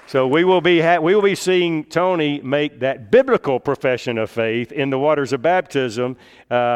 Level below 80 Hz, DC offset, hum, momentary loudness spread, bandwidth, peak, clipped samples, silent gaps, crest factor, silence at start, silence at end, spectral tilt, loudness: -60 dBFS; under 0.1%; none; 8 LU; 13.5 kHz; -2 dBFS; under 0.1%; none; 16 dB; 0.1 s; 0 s; -5.5 dB/octave; -18 LUFS